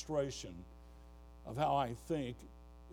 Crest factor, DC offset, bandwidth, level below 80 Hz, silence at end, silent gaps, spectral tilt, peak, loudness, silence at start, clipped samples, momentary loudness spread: 18 dB; under 0.1%; 18 kHz; -56 dBFS; 0 s; none; -5.5 dB/octave; -22 dBFS; -39 LUFS; 0 s; under 0.1%; 24 LU